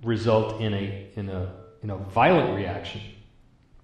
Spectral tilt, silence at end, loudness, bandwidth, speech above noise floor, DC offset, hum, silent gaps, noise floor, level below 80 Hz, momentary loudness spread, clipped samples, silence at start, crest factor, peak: -7.5 dB/octave; 0.6 s; -25 LUFS; 9.2 kHz; 31 dB; under 0.1%; none; none; -56 dBFS; -52 dBFS; 17 LU; under 0.1%; 0 s; 20 dB; -6 dBFS